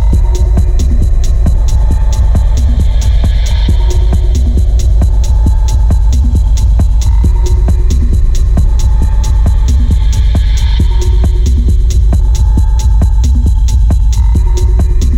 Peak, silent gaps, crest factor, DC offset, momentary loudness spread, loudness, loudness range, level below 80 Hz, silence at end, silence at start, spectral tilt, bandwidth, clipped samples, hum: -2 dBFS; none; 6 dB; under 0.1%; 1 LU; -11 LUFS; 1 LU; -8 dBFS; 0 s; 0 s; -6.5 dB/octave; 10 kHz; under 0.1%; none